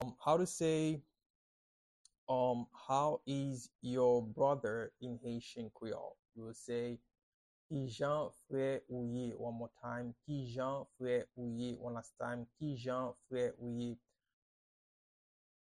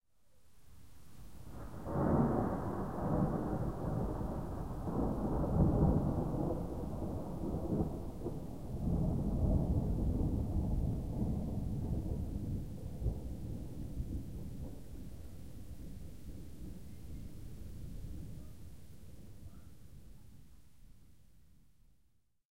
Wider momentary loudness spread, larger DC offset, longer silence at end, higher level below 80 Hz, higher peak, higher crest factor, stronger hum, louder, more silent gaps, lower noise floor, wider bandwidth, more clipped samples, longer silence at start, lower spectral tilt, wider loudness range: second, 12 LU vs 20 LU; second, under 0.1% vs 0.4%; first, 1.8 s vs 0 s; second, -72 dBFS vs -44 dBFS; about the same, -20 dBFS vs -18 dBFS; about the same, 20 dB vs 20 dB; neither; about the same, -40 LUFS vs -38 LUFS; first, 1.26-2.05 s, 2.18-2.27 s, 3.75-3.79 s, 6.19-6.23 s, 7.23-7.69 s vs none; first, under -90 dBFS vs -74 dBFS; second, 11.5 kHz vs 16 kHz; neither; about the same, 0 s vs 0 s; second, -6 dB/octave vs -9.5 dB/octave; second, 7 LU vs 16 LU